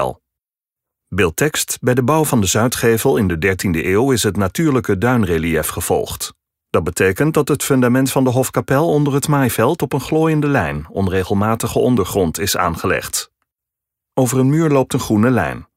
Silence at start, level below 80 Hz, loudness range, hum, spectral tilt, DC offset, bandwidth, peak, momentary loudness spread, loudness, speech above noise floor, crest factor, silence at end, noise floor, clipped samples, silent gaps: 0 s; -40 dBFS; 2 LU; none; -5 dB/octave; under 0.1%; 16.5 kHz; -2 dBFS; 5 LU; -16 LUFS; 71 dB; 14 dB; 0.15 s; -87 dBFS; under 0.1%; none